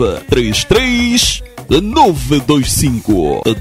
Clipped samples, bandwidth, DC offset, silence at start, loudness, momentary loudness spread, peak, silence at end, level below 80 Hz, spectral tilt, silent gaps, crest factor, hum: under 0.1%; 16.5 kHz; under 0.1%; 0 s; -12 LUFS; 4 LU; 0 dBFS; 0 s; -26 dBFS; -4 dB/octave; none; 12 dB; none